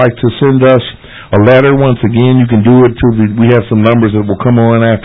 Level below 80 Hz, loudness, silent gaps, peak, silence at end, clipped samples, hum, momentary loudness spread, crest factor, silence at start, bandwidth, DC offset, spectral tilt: -34 dBFS; -8 LUFS; none; 0 dBFS; 0.05 s; 0.2%; none; 5 LU; 8 dB; 0 s; 4 kHz; under 0.1%; -10.5 dB/octave